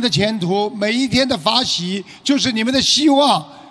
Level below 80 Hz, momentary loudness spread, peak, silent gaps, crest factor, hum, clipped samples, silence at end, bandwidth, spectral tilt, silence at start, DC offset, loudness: -48 dBFS; 7 LU; 0 dBFS; none; 16 dB; none; under 0.1%; 0 s; 11 kHz; -3.5 dB/octave; 0 s; under 0.1%; -16 LUFS